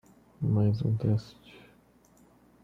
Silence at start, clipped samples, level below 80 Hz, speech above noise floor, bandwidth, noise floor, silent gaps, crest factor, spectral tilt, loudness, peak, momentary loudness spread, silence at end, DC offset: 0.4 s; under 0.1%; -60 dBFS; 33 dB; 6.2 kHz; -61 dBFS; none; 16 dB; -9.5 dB/octave; -29 LUFS; -14 dBFS; 8 LU; 1.3 s; under 0.1%